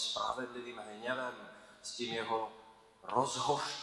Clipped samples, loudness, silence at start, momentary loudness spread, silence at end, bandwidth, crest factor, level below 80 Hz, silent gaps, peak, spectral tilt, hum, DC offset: under 0.1%; -38 LUFS; 0 s; 16 LU; 0 s; 12 kHz; 24 dB; -74 dBFS; none; -14 dBFS; -2.5 dB/octave; none; under 0.1%